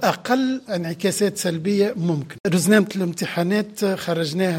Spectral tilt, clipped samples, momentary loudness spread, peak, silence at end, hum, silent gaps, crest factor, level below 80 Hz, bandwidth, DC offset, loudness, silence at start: -5 dB/octave; under 0.1%; 7 LU; -4 dBFS; 0 s; none; 2.40-2.44 s; 18 dB; -66 dBFS; 16.5 kHz; under 0.1%; -21 LUFS; 0 s